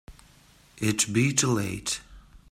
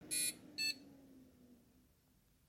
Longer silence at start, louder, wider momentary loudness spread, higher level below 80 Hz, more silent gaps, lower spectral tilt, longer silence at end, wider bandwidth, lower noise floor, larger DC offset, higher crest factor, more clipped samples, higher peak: about the same, 0.1 s vs 0 s; first, -26 LUFS vs -40 LUFS; second, 9 LU vs 24 LU; first, -54 dBFS vs -80 dBFS; neither; first, -3.5 dB/octave vs 0.5 dB/octave; second, 0.15 s vs 0.95 s; about the same, 16 kHz vs 16.5 kHz; second, -57 dBFS vs -73 dBFS; neither; about the same, 22 dB vs 20 dB; neither; first, -8 dBFS vs -26 dBFS